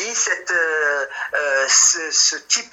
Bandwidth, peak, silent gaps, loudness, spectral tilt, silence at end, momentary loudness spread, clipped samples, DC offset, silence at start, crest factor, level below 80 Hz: 16 kHz; -2 dBFS; none; -16 LUFS; 3 dB/octave; 0.05 s; 9 LU; under 0.1%; under 0.1%; 0 s; 18 dB; -68 dBFS